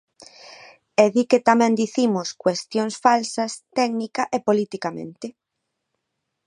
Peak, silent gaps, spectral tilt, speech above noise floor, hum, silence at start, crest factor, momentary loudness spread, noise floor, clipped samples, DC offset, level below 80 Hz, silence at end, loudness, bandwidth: 0 dBFS; none; -4.5 dB/octave; 58 dB; none; 0.45 s; 22 dB; 12 LU; -79 dBFS; under 0.1%; under 0.1%; -72 dBFS; 1.15 s; -21 LUFS; 11 kHz